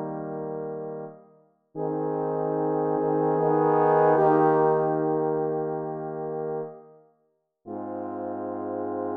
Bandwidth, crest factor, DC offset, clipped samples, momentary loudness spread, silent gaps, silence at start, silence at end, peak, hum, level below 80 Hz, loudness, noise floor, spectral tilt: 3.6 kHz; 18 dB; under 0.1%; under 0.1%; 15 LU; none; 0 s; 0 s; -8 dBFS; none; -76 dBFS; -26 LUFS; -72 dBFS; -11.5 dB/octave